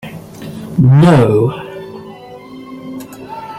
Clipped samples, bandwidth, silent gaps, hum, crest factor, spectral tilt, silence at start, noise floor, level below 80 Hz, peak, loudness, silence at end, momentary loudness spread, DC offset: under 0.1%; 14 kHz; none; none; 14 dB; -8.5 dB/octave; 0.05 s; -33 dBFS; -46 dBFS; -2 dBFS; -10 LUFS; 0 s; 25 LU; under 0.1%